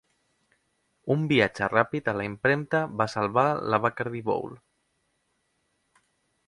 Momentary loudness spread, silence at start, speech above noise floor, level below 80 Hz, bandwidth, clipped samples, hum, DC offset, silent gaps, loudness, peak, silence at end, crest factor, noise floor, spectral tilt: 7 LU; 1.05 s; 48 dB; -62 dBFS; 11.5 kHz; under 0.1%; none; under 0.1%; none; -26 LUFS; -4 dBFS; 1.9 s; 24 dB; -74 dBFS; -6.5 dB/octave